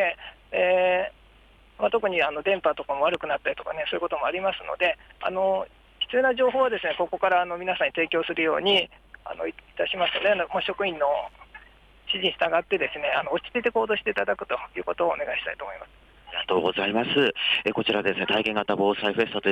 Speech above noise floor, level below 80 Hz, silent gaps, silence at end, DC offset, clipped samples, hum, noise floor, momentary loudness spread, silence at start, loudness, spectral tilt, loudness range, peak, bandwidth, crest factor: 29 dB; -58 dBFS; none; 0 s; under 0.1%; under 0.1%; none; -55 dBFS; 10 LU; 0 s; -25 LUFS; -5.5 dB/octave; 3 LU; -10 dBFS; 9 kHz; 16 dB